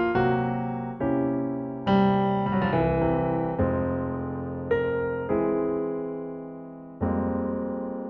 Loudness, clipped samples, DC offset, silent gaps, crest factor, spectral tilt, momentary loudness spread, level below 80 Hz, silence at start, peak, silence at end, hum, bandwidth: -26 LUFS; under 0.1%; under 0.1%; none; 16 dB; -10 dB/octave; 9 LU; -46 dBFS; 0 s; -10 dBFS; 0 s; none; 5.8 kHz